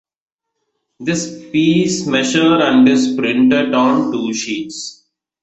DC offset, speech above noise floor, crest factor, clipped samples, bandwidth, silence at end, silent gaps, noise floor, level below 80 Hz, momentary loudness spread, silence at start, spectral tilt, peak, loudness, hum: under 0.1%; 59 dB; 14 dB; under 0.1%; 8.2 kHz; 0.5 s; none; -73 dBFS; -56 dBFS; 12 LU; 1 s; -4.5 dB/octave; -2 dBFS; -14 LUFS; none